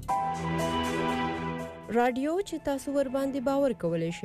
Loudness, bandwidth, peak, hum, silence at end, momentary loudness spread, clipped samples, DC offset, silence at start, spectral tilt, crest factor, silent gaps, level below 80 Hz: -29 LUFS; 15.5 kHz; -16 dBFS; none; 0 s; 5 LU; under 0.1%; under 0.1%; 0 s; -5.5 dB/octave; 14 dB; none; -52 dBFS